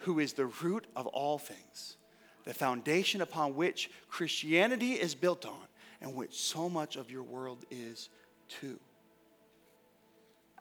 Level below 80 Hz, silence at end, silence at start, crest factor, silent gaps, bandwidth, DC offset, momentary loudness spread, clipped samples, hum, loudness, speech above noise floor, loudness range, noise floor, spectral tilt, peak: -88 dBFS; 1.8 s; 0 s; 22 dB; none; over 20 kHz; under 0.1%; 18 LU; under 0.1%; none; -35 LUFS; 31 dB; 14 LU; -66 dBFS; -4 dB/octave; -14 dBFS